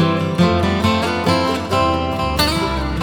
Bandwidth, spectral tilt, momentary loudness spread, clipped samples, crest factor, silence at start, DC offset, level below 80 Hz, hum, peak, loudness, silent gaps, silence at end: 19.5 kHz; -5.5 dB/octave; 4 LU; under 0.1%; 16 dB; 0 s; under 0.1%; -30 dBFS; none; -2 dBFS; -17 LUFS; none; 0 s